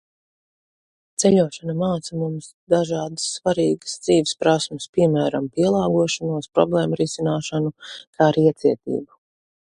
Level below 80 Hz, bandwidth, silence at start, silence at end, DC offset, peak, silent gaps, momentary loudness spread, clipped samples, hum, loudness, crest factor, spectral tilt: -58 dBFS; 11.5 kHz; 1.2 s; 0.7 s; under 0.1%; -2 dBFS; 2.54-2.67 s, 4.89-4.93 s, 8.07-8.13 s; 9 LU; under 0.1%; none; -21 LUFS; 20 dB; -5.5 dB/octave